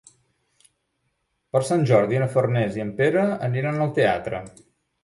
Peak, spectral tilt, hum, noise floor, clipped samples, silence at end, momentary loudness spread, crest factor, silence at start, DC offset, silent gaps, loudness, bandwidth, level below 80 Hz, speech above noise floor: -6 dBFS; -7 dB/octave; none; -73 dBFS; under 0.1%; 0.55 s; 7 LU; 18 dB; 1.55 s; under 0.1%; none; -22 LUFS; 11.5 kHz; -58 dBFS; 52 dB